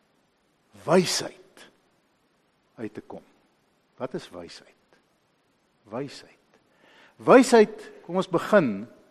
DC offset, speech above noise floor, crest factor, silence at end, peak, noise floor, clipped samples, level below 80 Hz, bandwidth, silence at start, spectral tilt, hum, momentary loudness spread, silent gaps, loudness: under 0.1%; 45 dB; 24 dB; 0.25 s; -2 dBFS; -68 dBFS; under 0.1%; -70 dBFS; 13 kHz; 0.85 s; -5 dB/octave; none; 25 LU; none; -22 LUFS